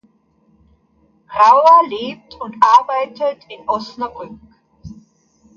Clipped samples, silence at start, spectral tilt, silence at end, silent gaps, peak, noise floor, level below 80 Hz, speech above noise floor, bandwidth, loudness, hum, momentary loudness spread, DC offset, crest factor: under 0.1%; 1.3 s; -4 dB/octave; 0.7 s; none; 0 dBFS; -57 dBFS; -56 dBFS; 43 dB; 7.2 kHz; -14 LUFS; none; 21 LU; under 0.1%; 18 dB